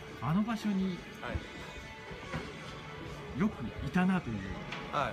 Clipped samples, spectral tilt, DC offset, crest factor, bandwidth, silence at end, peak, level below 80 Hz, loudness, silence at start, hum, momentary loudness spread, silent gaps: under 0.1%; -6.5 dB/octave; under 0.1%; 18 dB; 13.5 kHz; 0 s; -18 dBFS; -52 dBFS; -36 LUFS; 0 s; none; 13 LU; none